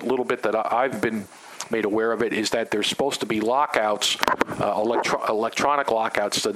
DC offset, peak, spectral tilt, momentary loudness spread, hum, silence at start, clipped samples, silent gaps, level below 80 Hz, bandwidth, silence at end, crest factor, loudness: under 0.1%; 0 dBFS; -3 dB/octave; 5 LU; none; 0 s; under 0.1%; none; -60 dBFS; 16 kHz; 0 s; 24 dB; -23 LUFS